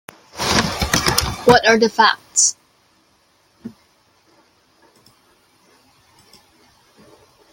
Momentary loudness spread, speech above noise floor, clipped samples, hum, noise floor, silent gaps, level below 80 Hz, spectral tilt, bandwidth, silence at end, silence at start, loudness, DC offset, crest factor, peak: 27 LU; 44 dB; under 0.1%; none; -59 dBFS; none; -40 dBFS; -2.5 dB/octave; 17 kHz; 3.85 s; 0.35 s; -15 LUFS; under 0.1%; 22 dB; 0 dBFS